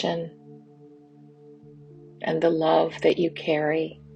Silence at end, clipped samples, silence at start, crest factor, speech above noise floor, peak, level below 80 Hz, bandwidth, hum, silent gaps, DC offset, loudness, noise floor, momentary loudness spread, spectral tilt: 0 s; under 0.1%; 0 s; 20 dB; 27 dB; -6 dBFS; -66 dBFS; 8.4 kHz; none; none; under 0.1%; -24 LUFS; -51 dBFS; 11 LU; -6.5 dB/octave